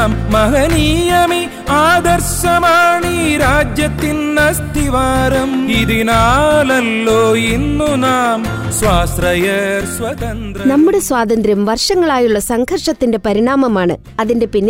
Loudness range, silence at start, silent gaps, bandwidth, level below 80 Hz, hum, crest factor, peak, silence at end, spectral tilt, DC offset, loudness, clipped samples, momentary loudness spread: 2 LU; 0 s; none; 16 kHz; -26 dBFS; none; 10 dB; -2 dBFS; 0 s; -4.5 dB/octave; under 0.1%; -13 LUFS; under 0.1%; 6 LU